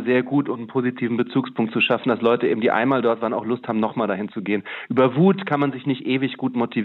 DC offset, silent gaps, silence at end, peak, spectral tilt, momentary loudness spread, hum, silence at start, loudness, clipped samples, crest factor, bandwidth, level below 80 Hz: under 0.1%; none; 0 s; -6 dBFS; -9 dB/octave; 7 LU; none; 0 s; -21 LUFS; under 0.1%; 16 dB; 4.3 kHz; -70 dBFS